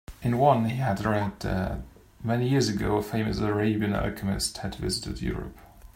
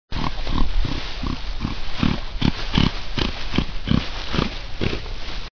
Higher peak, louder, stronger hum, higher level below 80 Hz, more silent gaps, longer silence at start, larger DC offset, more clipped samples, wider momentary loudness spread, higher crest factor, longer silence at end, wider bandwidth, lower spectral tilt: second, -8 dBFS vs -2 dBFS; about the same, -27 LUFS vs -25 LUFS; neither; second, -42 dBFS vs -26 dBFS; neither; about the same, 0.1 s vs 0.1 s; neither; neither; about the same, 10 LU vs 8 LU; about the same, 20 dB vs 18 dB; about the same, 0.05 s vs 0 s; first, 16 kHz vs 5.4 kHz; about the same, -5.5 dB/octave vs -6 dB/octave